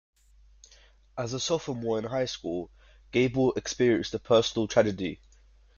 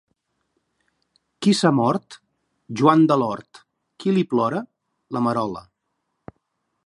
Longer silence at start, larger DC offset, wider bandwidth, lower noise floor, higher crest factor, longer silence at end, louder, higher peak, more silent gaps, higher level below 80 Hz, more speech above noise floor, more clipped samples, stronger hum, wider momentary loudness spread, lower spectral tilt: second, 1.15 s vs 1.4 s; neither; second, 7.4 kHz vs 11.5 kHz; second, -58 dBFS vs -76 dBFS; about the same, 20 dB vs 22 dB; second, 0.6 s vs 1.25 s; second, -28 LUFS vs -21 LUFS; second, -10 dBFS vs -2 dBFS; neither; first, -56 dBFS vs -66 dBFS; second, 31 dB vs 56 dB; neither; neither; second, 12 LU vs 16 LU; second, -5 dB/octave vs -6.5 dB/octave